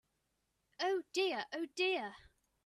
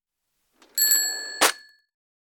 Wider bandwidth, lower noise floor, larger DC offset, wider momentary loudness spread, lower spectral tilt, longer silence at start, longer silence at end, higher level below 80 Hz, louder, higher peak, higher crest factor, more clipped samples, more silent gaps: second, 13 kHz vs 19 kHz; first, -83 dBFS vs -77 dBFS; neither; second, 6 LU vs 11 LU; first, -2.5 dB/octave vs 3 dB/octave; about the same, 0.8 s vs 0.75 s; second, 0.45 s vs 0.75 s; about the same, -78 dBFS vs -76 dBFS; second, -37 LUFS vs -21 LUFS; second, -22 dBFS vs -4 dBFS; about the same, 18 dB vs 22 dB; neither; neither